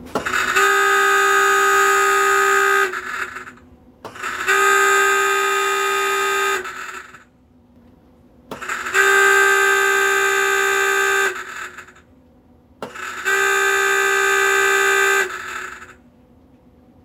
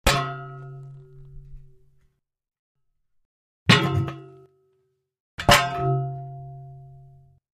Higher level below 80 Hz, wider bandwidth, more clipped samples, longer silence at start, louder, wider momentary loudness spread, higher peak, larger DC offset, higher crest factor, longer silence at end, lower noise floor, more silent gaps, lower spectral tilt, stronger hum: second, -58 dBFS vs -42 dBFS; about the same, 16 kHz vs 15.5 kHz; neither; about the same, 0 s vs 0.05 s; first, -16 LUFS vs -21 LUFS; second, 16 LU vs 24 LU; about the same, -2 dBFS vs -2 dBFS; neither; second, 16 dB vs 26 dB; first, 1.1 s vs 0.7 s; second, -52 dBFS vs -71 dBFS; second, none vs 2.59-2.75 s, 3.25-3.66 s, 5.20-5.38 s; second, -0.5 dB/octave vs -4 dB/octave; neither